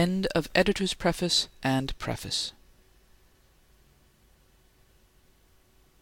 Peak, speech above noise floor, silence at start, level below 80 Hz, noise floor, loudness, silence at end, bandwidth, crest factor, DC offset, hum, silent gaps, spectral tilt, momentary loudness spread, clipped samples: -8 dBFS; 34 dB; 0 s; -48 dBFS; -61 dBFS; -27 LUFS; 3.5 s; 17 kHz; 24 dB; under 0.1%; none; none; -4 dB/octave; 8 LU; under 0.1%